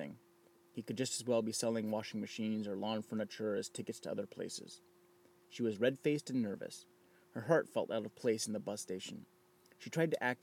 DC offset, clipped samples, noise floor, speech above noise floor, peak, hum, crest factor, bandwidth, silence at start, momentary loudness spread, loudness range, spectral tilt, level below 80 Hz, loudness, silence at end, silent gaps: under 0.1%; under 0.1%; -68 dBFS; 29 dB; -18 dBFS; none; 22 dB; 17 kHz; 0 s; 15 LU; 4 LU; -4.5 dB/octave; under -90 dBFS; -38 LUFS; 0.05 s; none